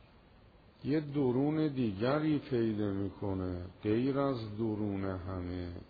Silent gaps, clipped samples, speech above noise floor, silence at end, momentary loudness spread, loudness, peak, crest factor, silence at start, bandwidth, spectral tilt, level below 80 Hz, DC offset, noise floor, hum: none; under 0.1%; 27 dB; 0 s; 9 LU; -34 LUFS; -20 dBFS; 14 dB; 0.8 s; 5 kHz; -7.5 dB/octave; -60 dBFS; under 0.1%; -60 dBFS; none